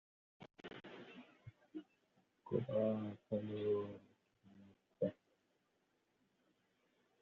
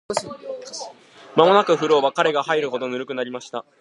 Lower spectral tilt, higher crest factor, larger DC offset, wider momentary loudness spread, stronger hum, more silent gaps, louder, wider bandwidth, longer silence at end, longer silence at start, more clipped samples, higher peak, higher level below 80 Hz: first, -7.5 dB/octave vs -4 dB/octave; about the same, 22 dB vs 20 dB; neither; first, 23 LU vs 18 LU; neither; neither; second, -42 LUFS vs -20 LUFS; second, 6.8 kHz vs 11.5 kHz; first, 2.1 s vs 0.2 s; first, 0.4 s vs 0.1 s; neither; second, -24 dBFS vs 0 dBFS; second, -84 dBFS vs -68 dBFS